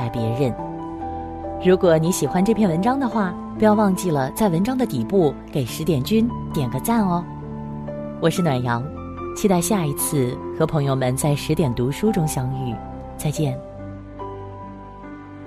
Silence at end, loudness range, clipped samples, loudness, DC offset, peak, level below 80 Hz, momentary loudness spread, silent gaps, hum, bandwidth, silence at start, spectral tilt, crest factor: 0 s; 4 LU; under 0.1%; -21 LUFS; under 0.1%; -2 dBFS; -42 dBFS; 15 LU; none; none; 15.5 kHz; 0 s; -6 dB/octave; 18 dB